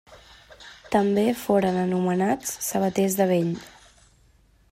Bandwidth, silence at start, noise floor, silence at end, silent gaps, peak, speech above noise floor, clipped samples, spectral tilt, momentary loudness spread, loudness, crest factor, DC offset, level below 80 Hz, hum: 16 kHz; 0.1 s; -59 dBFS; 1 s; none; -8 dBFS; 36 dB; under 0.1%; -5.5 dB/octave; 8 LU; -23 LUFS; 18 dB; under 0.1%; -58 dBFS; none